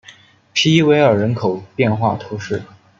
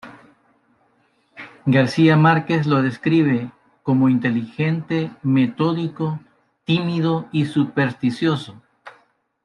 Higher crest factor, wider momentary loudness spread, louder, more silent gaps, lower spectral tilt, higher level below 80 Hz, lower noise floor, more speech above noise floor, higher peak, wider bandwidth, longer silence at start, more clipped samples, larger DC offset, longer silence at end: about the same, 16 dB vs 18 dB; about the same, 13 LU vs 12 LU; about the same, -17 LUFS vs -19 LUFS; neither; second, -5.5 dB/octave vs -8 dB/octave; first, -56 dBFS vs -62 dBFS; second, -45 dBFS vs -62 dBFS; second, 30 dB vs 44 dB; about the same, -2 dBFS vs -2 dBFS; second, 7.6 kHz vs 10.5 kHz; about the same, 0.1 s vs 0.05 s; neither; neither; second, 0.35 s vs 0.55 s